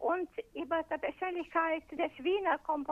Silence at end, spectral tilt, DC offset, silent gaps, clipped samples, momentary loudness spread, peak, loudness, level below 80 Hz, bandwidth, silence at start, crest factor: 0 s; -5.5 dB/octave; under 0.1%; none; under 0.1%; 6 LU; -16 dBFS; -34 LUFS; -66 dBFS; 7.6 kHz; 0 s; 18 dB